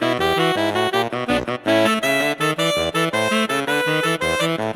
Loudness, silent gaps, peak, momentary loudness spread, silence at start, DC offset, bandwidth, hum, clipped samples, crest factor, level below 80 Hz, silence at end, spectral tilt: -19 LUFS; none; -4 dBFS; 3 LU; 0 s; under 0.1%; 19 kHz; none; under 0.1%; 14 dB; -48 dBFS; 0 s; -4 dB/octave